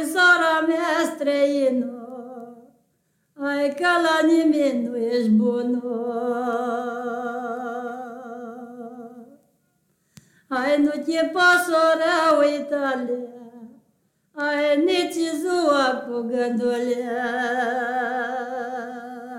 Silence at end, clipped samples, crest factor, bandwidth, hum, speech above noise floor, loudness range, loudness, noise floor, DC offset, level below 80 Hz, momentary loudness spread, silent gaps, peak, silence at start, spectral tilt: 0 s; under 0.1%; 16 dB; 16.5 kHz; none; 48 dB; 9 LU; -22 LUFS; -69 dBFS; under 0.1%; -72 dBFS; 18 LU; none; -6 dBFS; 0 s; -4 dB/octave